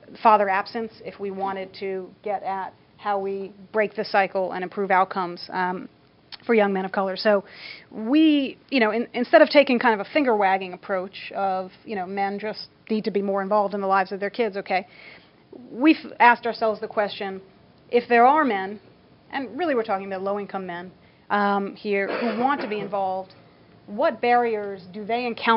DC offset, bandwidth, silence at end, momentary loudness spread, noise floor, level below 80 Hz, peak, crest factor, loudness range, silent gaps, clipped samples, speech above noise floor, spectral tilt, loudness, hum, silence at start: under 0.1%; 5.8 kHz; 0 s; 16 LU; -47 dBFS; -70 dBFS; -2 dBFS; 22 dB; 6 LU; none; under 0.1%; 24 dB; -8 dB/octave; -23 LUFS; none; 0.1 s